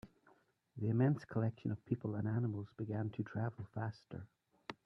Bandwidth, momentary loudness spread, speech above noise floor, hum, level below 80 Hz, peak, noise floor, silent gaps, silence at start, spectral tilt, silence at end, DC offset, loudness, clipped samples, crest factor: 6.2 kHz; 18 LU; 33 dB; none; -74 dBFS; -22 dBFS; -72 dBFS; none; 0.05 s; -10 dB/octave; 0.1 s; under 0.1%; -40 LUFS; under 0.1%; 18 dB